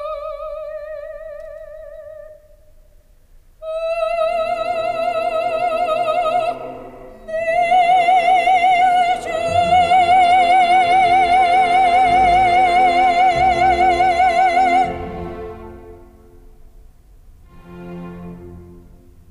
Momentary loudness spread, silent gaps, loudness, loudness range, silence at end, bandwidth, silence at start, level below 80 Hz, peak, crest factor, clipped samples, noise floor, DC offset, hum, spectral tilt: 21 LU; none; -15 LUFS; 17 LU; 0.55 s; 11.5 kHz; 0 s; -42 dBFS; -4 dBFS; 12 dB; under 0.1%; -48 dBFS; under 0.1%; none; -4 dB/octave